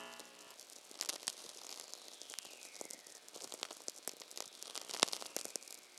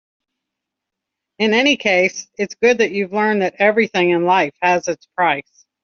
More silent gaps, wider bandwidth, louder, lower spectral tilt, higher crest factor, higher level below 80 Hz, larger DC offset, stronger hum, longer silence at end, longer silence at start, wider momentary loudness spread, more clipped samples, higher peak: neither; first, 16 kHz vs 7.2 kHz; second, -44 LUFS vs -17 LUFS; second, 0.5 dB/octave vs -2.5 dB/octave; first, 42 dB vs 16 dB; second, under -90 dBFS vs -64 dBFS; neither; neither; second, 0 s vs 0.4 s; second, 0 s vs 1.4 s; first, 17 LU vs 6 LU; neither; second, -6 dBFS vs -2 dBFS